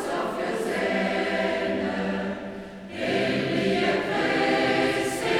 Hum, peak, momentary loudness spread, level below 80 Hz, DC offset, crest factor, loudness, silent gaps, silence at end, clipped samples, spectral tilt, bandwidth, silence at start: none; -10 dBFS; 9 LU; -56 dBFS; under 0.1%; 14 dB; -25 LUFS; none; 0 s; under 0.1%; -5 dB/octave; 16.5 kHz; 0 s